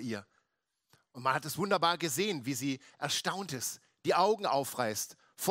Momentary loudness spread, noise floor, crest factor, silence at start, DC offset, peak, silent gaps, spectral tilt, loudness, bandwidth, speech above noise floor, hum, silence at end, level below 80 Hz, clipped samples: 10 LU; -83 dBFS; 20 dB; 0 s; under 0.1%; -14 dBFS; none; -3.5 dB/octave; -33 LUFS; 16 kHz; 50 dB; none; 0 s; -80 dBFS; under 0.1%